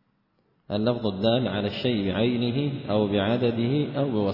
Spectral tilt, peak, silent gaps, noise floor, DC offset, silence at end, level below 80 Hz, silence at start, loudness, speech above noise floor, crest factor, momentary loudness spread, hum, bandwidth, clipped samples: -9.5 dB/octave; -10 dBFS; none; -69 dBFS; under 0.1%; 0 s; -60 dBFS; 0.7 s; -25 LUFS; 44 dB; 14 dB; 4 LU; none; 5.8 kHz; under 0.1%